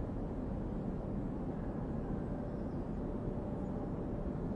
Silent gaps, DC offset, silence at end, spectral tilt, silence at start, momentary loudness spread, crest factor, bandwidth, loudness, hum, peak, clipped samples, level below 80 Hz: none; under 0.1%; 0 s; -10.5 dB/octave; 0 s; 1 LU; 12 dB; 7.8 kHz; -40 LUFS; none; -26 dBFS; under 0.1%; -46 dBFS